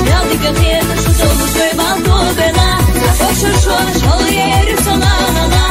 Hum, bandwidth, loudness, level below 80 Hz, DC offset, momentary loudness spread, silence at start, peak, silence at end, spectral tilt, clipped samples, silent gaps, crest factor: none; 16.5 kHz; -11 LUFS; -16 dBFS; under 0.1%; 1 LU; 0 s; 0 dBFS; 0 s; -4.5 dB/octave; under 0.1%; none; 10 dB